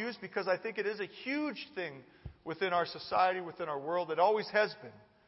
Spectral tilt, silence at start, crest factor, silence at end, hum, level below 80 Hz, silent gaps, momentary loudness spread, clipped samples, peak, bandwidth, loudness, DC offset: -2 dB/octave; 0 s; 20 dB; 0.3 s; none; -66 dBFS; none; 15 LU; under 0.1%; -16 dBFS; 5.8 kHz; -34 LUFS; under 0.1%